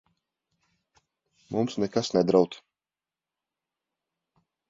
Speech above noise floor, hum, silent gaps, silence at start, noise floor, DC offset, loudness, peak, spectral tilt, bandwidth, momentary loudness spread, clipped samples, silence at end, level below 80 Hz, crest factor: over 65 dB; none; none; 1.5 s; under -90 dBFS; under 0.1%; -26 LUFS; -6 dBFS; -6 dB/octave; 7.8 kHz; 10 LU; under 0.1%; 2.15 s; -68 dBFS; 24 dB